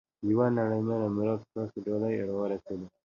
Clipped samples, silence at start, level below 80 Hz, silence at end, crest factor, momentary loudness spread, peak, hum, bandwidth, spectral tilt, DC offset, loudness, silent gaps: under 0.1%; 0.2 s; -64 dBFS; 0.2 s; 18 dB; 10 LU; -12 dBFS; none; 7 kHz; -10 dB/octave; under 0.1%; -30 LUFS; none